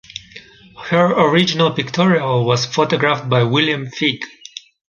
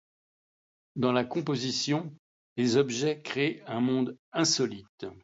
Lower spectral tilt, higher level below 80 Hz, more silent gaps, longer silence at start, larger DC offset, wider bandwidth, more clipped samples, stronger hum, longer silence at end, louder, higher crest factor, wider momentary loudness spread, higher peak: about the same, -5.5 dB/octave vs -4.5 dB/octave; first, -56 dBFS vs -72 dBFS; second, none vs 2.19-2.56 s, 4.19-4.32 s, 4.89-4.98 s; second, 0.35 s vs 0.95 s; neither; about the same, 7.4 kHz vs 8 kHz; neither; neither; first, 0.65 s vs 0.05 s; first, -16 LUFS vs -29 LUFS; about the same, 16 dB vs 20 dB; first, 19 LU vs 15 LU; first, 0 dBFS vs -12 dBFS